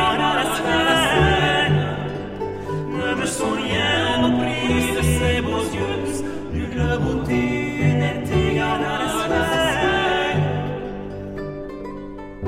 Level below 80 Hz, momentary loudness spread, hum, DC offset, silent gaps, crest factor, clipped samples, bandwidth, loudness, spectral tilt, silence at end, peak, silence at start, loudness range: -34 dBFS; 13 LU; none; under 0.1%; none; 16 dB; under 0.1%; 16 kHz; -20 LUFS; -5 dB/octave; 0 s; -4 dBFS; 0 s; 2 LU